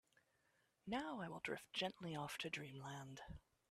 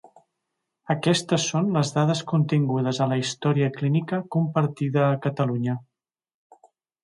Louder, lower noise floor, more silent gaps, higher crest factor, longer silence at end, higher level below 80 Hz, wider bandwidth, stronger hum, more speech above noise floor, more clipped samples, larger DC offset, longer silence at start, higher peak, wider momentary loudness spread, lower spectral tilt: second, -48 LUFS vs -24 LUFS; second, -82 dBFS vs -88 dBFS; neither; about the same, 20 dB vs 16 dB; second, 0.3 s vs 1.2 s; second, -74 dBFS vs -66 dBFS; first, 14.5 kHz vs 11.5 kHz; neither; second, 33 dB vs 66 dB; neither; neither; about the same, 0.85 s vs 0.9 s; second, -30 dBFS vs -8 dBFS; first, 13 LU vs 3 LU; second, -4.5 dB/octave vs -6 dB/octave